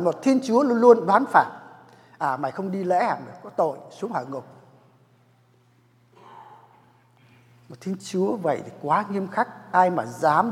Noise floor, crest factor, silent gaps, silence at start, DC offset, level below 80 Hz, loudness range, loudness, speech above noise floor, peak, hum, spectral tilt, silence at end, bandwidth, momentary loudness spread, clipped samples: -60 dBFS; 22 dB; none; 0 s; under 0.1%; -80 dBFS; 17 LU; -23 LUFS; 38 dB; -2 dBFS; none; -6.5 dB/octave; 0 s; 13.5 kHz; 15 LU; under 0.1%